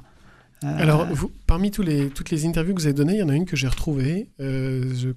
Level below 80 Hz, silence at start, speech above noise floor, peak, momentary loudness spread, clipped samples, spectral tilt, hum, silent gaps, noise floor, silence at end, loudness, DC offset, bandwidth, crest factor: -32 dBFS; 0.6 s; 30 dB; -6 dBFS; 7 LU; under 0.1%; -6.5 dB/octave; none; none; -51 dBFS; 0 s; -23 LUFS; under 0.1%; 14.5 kHz; 16 dB